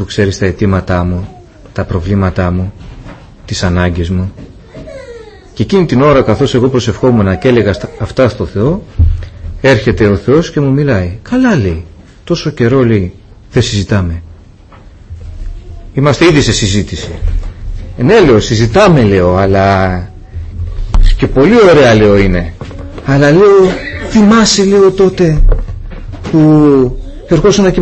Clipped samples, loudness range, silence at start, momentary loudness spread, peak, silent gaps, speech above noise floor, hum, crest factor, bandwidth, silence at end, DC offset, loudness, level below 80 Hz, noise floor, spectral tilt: under 0.1%; 8 LU; 0 s; 19 LU; 0 dBFS; none; 27 dB; none; 10 dB; 8.6 kHz; 0 s; under 0.1%; -10 LUFS; -20 dBFS; -36 dBFS; -6 dB/octave